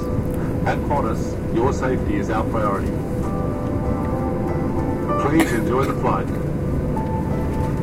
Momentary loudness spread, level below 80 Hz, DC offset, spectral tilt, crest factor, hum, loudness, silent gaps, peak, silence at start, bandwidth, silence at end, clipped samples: 5 LU; -30 dBFS; under 0.1%; -7.5 dB/octave; 18 dB; none; -22 LUFS; none; -2 dBFS; 0 s; 16 kHz; 0 s; under 0.1%